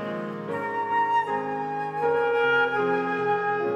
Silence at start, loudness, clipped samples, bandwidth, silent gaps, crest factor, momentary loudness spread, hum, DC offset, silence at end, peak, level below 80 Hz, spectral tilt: 0 s; -25 LUFS; under 0.1%; 8.8 kHz; none; 14 dB; 9 LU; none; under 0.1%; 0 s; -12 dBFS; -78 dBFS; -6.5 dB/octave